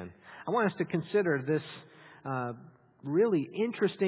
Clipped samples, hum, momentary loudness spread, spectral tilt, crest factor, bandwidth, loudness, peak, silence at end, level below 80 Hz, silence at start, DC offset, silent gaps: under 0.1%; none; 18 LU; -6 dB/octave; 16 dB; 4 kHz; -31 LUFS; -14 dBFS; 0 s; -72 dBFS; 0 s; under 0.1%; none